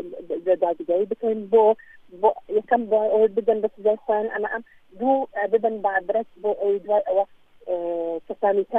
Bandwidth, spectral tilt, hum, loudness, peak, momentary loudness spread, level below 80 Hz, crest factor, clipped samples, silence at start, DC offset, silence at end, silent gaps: 3.8 kHz; -8 dB/octave; none; -23 LUFS; -6 dBFS; 9 LU; -66 dBFS; 16 dB; under 0.1%; 0 s; under 0.1%; 0 s; none